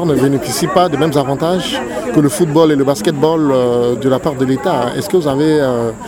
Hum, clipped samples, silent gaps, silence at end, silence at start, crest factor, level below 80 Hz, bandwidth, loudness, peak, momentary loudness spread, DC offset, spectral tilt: none; under 0.1%; none; 0 s; 0 s; 14 dB; -44 dBFS; 18 kHz; -14 LUFS; 0 dBFS; 4 LU; under 0.1%; -6 dB/octave